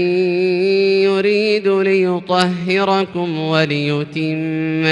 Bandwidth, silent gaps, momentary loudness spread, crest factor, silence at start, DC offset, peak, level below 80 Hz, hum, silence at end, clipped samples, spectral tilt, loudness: 11 kHz; none; 6 LU; 16 dB; 0 s; under 0.1%; 0 dBFS; -62 dBFS; none; 0 s; under 0.1%; -6.5 dB/octave; -16 LUFS